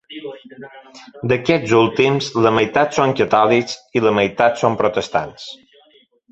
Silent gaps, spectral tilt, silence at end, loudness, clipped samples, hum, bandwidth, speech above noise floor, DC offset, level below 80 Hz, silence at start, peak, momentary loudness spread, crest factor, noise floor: none; -5.5 dB/octave; 0.75 s; -16 LUFS; under 0.1%; none; 8.2 kHz; 37 dB; under 0.1%; -54 dBFS; 0.1 s; 0 dBFS; 19 LU; 18 dB; -54 dBFS